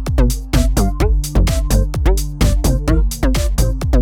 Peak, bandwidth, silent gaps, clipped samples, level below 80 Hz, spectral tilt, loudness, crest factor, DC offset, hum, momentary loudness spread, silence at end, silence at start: -2 dBFS; 17 kHz; none; under 0.1%; -16 dBFS; -5.5 dB/octave; -17 LUFS; 12 dB; under 0.1%; none; 2 LU; 0 s; 0 s